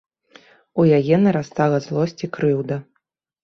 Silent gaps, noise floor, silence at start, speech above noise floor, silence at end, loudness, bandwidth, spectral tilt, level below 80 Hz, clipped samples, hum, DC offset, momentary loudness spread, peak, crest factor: none; -73 dBFS; 0.75 s; 54 dB; 0.6 s; -19 LUFS; 6.8 kHz; -8 dB/octave; -58 dBFS; under 0.1%; none; under 0.1%; 11 LU; -4 dBFS; 16 dB